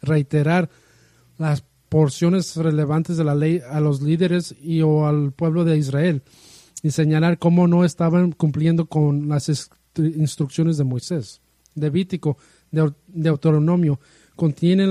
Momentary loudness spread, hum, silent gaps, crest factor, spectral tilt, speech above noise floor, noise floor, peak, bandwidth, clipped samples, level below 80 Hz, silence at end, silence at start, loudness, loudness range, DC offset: 9 LU; none; none; 16 dB; -7.5 dB/octave; 36 dB; -55 dBFS; -4 dBFS; 11.5 kHz; under 0.1%; -58 dBFS; 0 s; 0.05 s; -20 LUFS; 4 LU; under 0.1%